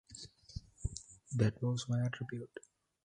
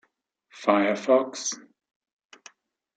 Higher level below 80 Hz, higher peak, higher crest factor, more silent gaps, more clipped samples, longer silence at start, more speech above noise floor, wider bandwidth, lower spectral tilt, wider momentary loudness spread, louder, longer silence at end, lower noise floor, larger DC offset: first, -54 dBFS vs -84 dBFS; second, -16 dBFS vs -6 dBFS; about the same, 22 dB vs 22 dB; neither; neither; second, 0.1 s vs 0.55 s; second, 19 dB vs 47 dB; first, 10.5 kHz vs 9.2 kHz; first, -6 dB/octave vs -3.5 dB/octave; first, 17 LU vs 10 LU; second, -38 LUFS vs -24 LUFS; second, 0.45 s vs 1.35 s; second, -55 dBFS vs -70 dBFS; neither